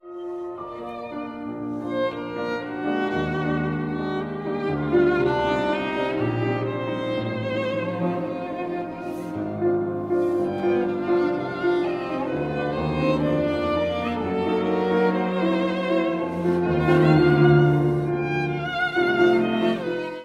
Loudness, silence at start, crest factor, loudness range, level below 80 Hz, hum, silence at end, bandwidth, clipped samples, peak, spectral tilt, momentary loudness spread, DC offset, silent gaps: -23 LUFS; 0.05 s; 18 dB; 7 LU; -48 dBFS; none; 0 s; 7.6 kHz; under 0.1%; -6 dBFS; -8 dB/octave; 11 LU; under 0.1%; none